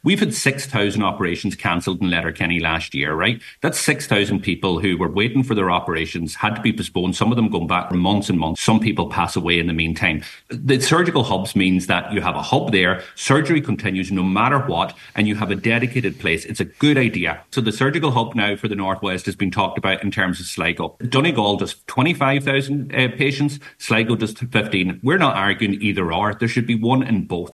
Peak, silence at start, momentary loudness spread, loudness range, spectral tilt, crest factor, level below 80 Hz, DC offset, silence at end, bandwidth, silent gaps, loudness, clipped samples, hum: -2 dBFS; 0.05 s; 6 LU; 2 LU; -5 dB/octave; 18 dB; -46 dBFS; under 0.1%; 0 s; 12.5 kHz; none; -19 LUFS; under 0.1%; none